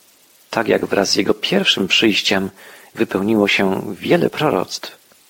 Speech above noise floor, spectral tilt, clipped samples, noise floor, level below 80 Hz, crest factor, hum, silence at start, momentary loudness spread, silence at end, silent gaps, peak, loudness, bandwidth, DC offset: 34 dB; -4 dB/octave; under 0.1%; -51 dBFS; -56 dBFS; 16 dB; none; 0.5 s; 12 LU; 0.35 s; none; -2 dBFS; -17 LUFS; 17 kHz; under 0.1%